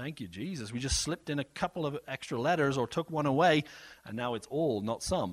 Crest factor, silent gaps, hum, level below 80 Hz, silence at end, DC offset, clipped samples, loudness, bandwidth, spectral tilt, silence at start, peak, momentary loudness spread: 20 dB; none; none; -50 dBFS; 0 s; under 0.1%; under 0.1%; -32 LUFS; 15 kHz; -4.5 dB/octave; 0 s; -12 dBFS; 13 LU